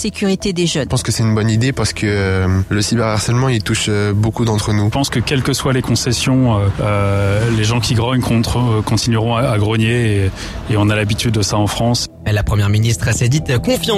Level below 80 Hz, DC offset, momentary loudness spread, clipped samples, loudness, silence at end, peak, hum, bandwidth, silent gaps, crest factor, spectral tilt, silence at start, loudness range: -32 dBFS; under 0.1%; 2 LU; under 0.1%; -15 LUFS; 0 s; -4 dBFS; none; 15 kHz; none; 10 dB; -5 dB/octave; 0 s; 1 LU